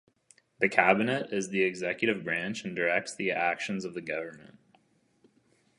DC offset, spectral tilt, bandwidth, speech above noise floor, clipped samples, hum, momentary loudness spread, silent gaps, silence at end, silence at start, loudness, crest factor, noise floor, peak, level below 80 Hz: under 0.1%; -4.5 dB/octave; 11.5 kHz; 38 dB; under 0.1%; none; 11 LU; none; 1.3 s; 0.6 s; -29 LUFS; 26 dB; -68 dBFS; -6 dBFS; -74 dBFS